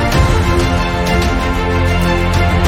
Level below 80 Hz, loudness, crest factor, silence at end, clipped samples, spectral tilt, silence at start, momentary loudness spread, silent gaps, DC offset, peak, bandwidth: -18 dBFS; -14 LUFS; 12 dB; 0 s; under 0.1%; -6 dB/octave; 0 s; 3 LU; none; under 0.1%; 0 dBFS; 16.5 kHz